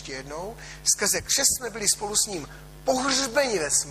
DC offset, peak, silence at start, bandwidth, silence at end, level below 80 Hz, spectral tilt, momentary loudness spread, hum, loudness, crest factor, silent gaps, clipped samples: under 0.1%; -6 dBFS; 0 s; 15.5 kHz; 0 s; -50 dBFS; -1 dB/octave; 15 LU; none; -23 LUFS; 20 dB; none; under 0.1%